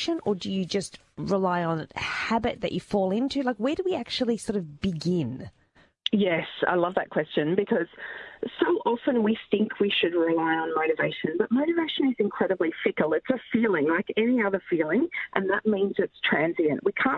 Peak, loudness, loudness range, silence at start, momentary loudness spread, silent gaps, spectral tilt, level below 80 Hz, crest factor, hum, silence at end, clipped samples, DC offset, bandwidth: -6 dBFS; -26 LUFS; 3 LU; 0 s; 6 LU; none; -6 dB/octave; -60 dBFS; 20 dB; none; 0 s; under 0.1%; under 0.1%; 11 kHz